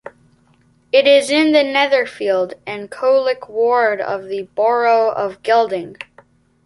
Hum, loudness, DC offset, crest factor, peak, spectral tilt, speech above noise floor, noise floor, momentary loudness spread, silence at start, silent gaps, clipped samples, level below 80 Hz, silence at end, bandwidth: none; -16 LUFS; under 0.1%; 16 dB; -2 dBFS; -3.5 dB/octave; 39 dB; -55 dBFS; 13 LU; 0.05 s; none; under 0.1%; -64 dBFS; 0.6 s; 11.5 kHz